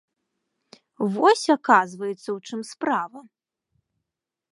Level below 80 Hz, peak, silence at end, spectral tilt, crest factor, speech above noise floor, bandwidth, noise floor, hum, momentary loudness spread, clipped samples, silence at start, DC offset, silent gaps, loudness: -82 dBFS; -2 dBFS; 1.3 s; -4.5 dB/octave; 22 dB; 62 dB; 11.5 kHz; -85 dBFS; none; 14 LU; under 0.1%; 1 s; under 0.1%; none; -22 LUFS